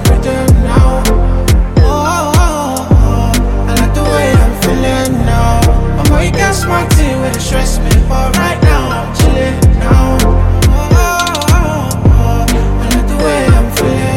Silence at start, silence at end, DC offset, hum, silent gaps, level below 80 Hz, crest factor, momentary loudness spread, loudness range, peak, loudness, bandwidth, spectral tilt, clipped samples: 0 s; 0 s; under 0.1%; none; none; -12 dBFS; 8 dB; 4 LU; 1 LU; 0 dBFS; -11 LUFS; 17 kHz; -5.5 dB/octave; under 0.1%